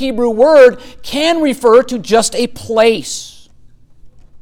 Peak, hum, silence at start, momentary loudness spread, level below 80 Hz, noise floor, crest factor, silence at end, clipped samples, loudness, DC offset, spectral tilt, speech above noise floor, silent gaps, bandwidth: 0 dBFS; none; 0 s; 15 LU; -42 dBFS; -41 dBFS; 12 dB; 0.05 s; under 0.1%; -11 LUFS; under 0.1%; -3 dB/octave; 29 dB; none; 16 kHz